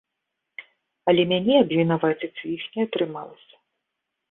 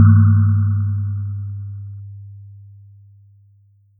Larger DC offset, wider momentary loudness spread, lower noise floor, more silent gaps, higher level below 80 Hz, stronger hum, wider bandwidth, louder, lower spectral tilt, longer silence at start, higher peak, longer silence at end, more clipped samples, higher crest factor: neither; about the same, 23 LU vs 25 LU; first, -81 dBFS vs -53 dBFS; neither; second, -66 dBFS vs -52 dBFS; neither; first, 4.1 kHz vs 1.6 kHz; second, -23 LUFS vs -17 LUFS; second, -10.5 dB/octave vs -14 dB/octave; first, 0.6 s vs 0 s; second, -4 dBFS vs 0 dBFS; second, 0.95 s vs 1.45 s; neither; about the same, 20 dB vs 18 dB